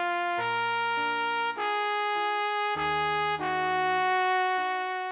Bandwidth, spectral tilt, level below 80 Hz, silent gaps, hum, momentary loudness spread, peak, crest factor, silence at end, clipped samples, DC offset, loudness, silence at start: 4 kHz; -0.5 dB/octave; -64 dBFS; none; none; 3 LU; -14 dBFS; 14 dB; 0 s; under 0.1%; under 0.1%; -27 LUFS; 0 s